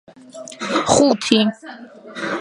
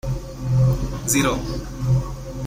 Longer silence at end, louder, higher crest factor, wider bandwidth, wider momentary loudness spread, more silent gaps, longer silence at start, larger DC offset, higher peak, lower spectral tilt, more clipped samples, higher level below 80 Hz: about the same, 0 s vs 0 s; first, -17 LUFS vs -22 LUFS; about the same, 20 dB vs 16 dB; second, 11.5 kHz vs 16 kHz; first, 22 LU vs 10 LU; neither; first, 0.35 s vs 0.05 s; neither; first, 0 dBFS vs -6 dBFS; second, -3.5 dB/octave vs -5 dB/octave; neither; second, -52 dBFS vs -32 dBFS